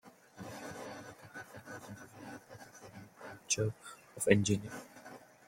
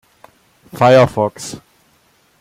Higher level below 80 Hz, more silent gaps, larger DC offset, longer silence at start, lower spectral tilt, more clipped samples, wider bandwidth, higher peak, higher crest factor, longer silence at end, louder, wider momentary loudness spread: second, -70 dBFS vs -52 dBFS; neither; neither; second, 0.05 s vs 0.75 s; second, -4.5 dB/octave vs -6 dB/octave; neither; about the same, 16.5 kHz vs 15.5 kHz; second, -10 dBFS vs 0 dBFS; first, 30 dB vs 16 dB; second, 0.2 s vs 0.85 s; second, -35 LUFS vs -13 LUFS; first, 23 LU vs 20 LU